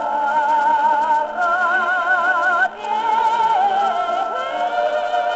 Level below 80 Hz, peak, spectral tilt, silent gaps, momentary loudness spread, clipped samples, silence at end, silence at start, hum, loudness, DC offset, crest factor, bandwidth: -60 dBFS; -6 dBFS; 1 dB/octave; none; 5 LU; under 0.1%; 0 s; 0 s; none; -18 LUFS; under 0.1%; 12 dB; 8 kHz